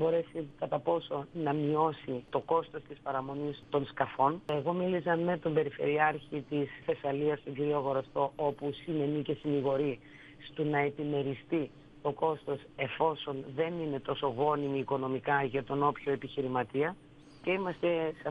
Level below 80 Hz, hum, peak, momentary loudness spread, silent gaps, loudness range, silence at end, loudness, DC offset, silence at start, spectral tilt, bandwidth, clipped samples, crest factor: -66 dBFS; none; -12 dBFS; 8 LU; none; 2 LU; 0 s; -33 LUFS; under 0.1%; 0 s; -8.5 dB/octave; 5.2 kHz; under 0.1%; 20 dB